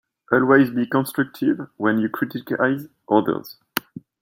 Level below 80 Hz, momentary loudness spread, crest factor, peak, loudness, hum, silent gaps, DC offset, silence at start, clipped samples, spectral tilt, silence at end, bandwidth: -64 dBFS; 13 LU; 20 dB; -2 dBFS; -21 LUFS; none; none; under 0.1%; 0.3 s; under 0.1%; -6.5 dB/octave; 0.2 s; 16.5 kHz